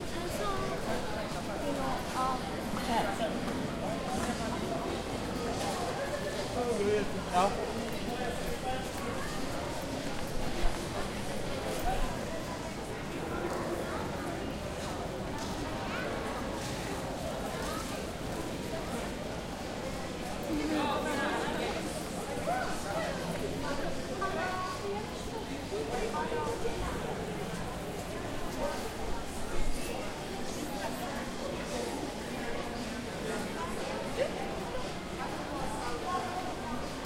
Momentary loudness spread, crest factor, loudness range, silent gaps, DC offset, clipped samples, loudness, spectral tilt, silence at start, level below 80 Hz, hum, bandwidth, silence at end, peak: 6 LU; 20 dB; 4 LU; none; under 0.1%; under 0.1%; -35 LUFS; -4.5 dB/octave; 0 s; -44 dBFS; none; 16 kHz; 0 s; -14 dBFS